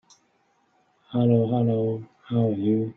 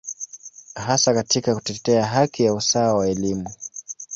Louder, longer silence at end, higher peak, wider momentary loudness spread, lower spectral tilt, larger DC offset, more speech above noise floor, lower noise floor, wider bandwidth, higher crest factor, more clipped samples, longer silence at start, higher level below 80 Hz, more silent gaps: second, -24 LUFS vs -20 LUFS; about the same, 0.05 s vs 0 s; second, -8 dBFS vs -4 dBFS; second, 9 LU vs 16 LU; first, -10.5 dB/octave vs -4 dB/octave; neither; first, 44 dB vs 22 dB; first, -67 dBFS vs -42 dBFS; second, 6.2 kHz vs 8 kHz; about the same, 16 dB vs 18 dB; neither; first, 1.1 s vs 0.05 s; second, -64 dBFS vs -54 dBFS; neither